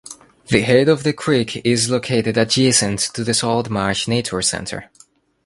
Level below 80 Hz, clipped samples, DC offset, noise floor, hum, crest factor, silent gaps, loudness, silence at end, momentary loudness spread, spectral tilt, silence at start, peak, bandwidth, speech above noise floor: -48 dBFS; under 0.1%; under 0.1%; -52 dBFS; none; 18 dB; none; -17 LUFS; 0.6 s; 6 LU; -4 dB/octave; 0.05 s; 0 dBFS; 11.5 kHz; 35 dB